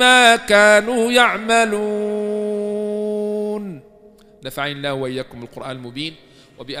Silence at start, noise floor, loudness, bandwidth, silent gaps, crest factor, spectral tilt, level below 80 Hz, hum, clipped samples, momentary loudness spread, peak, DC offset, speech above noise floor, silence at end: 0 s; -47 dBFS; -17 LUFS; 15.5 kHz; none; 18 dB; -3 dB/octave; -54 dBFS; none; under 0.1%; 20 LU; 0 dBFS; under 0.1%; 31 dB; 0 s